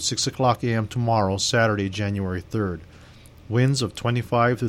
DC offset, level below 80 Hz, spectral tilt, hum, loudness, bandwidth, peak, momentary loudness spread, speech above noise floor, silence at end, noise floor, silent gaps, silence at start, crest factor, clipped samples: under 0.1%; -50 dBFS; -5 dB/octave; none; -23 LUFS; 13.5 kHz; -6 dBFS; 7 LU; 24 dB; 0 s; -47 dBFS; none; 0 s; 18 dB; under 0.1%